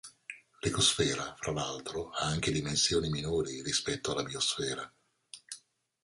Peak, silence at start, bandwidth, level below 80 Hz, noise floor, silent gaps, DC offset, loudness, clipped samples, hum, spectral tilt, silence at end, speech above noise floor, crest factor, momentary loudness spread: -14 dBFS; 0.05 s; 11.5 kHz; -54 dBFS; -58 dBFS; none; under 0.1%; -31 LUFS; under 0.1%; none; -3 dB/octave; 0.45 s; 25 dB; 20 dB; 20 LU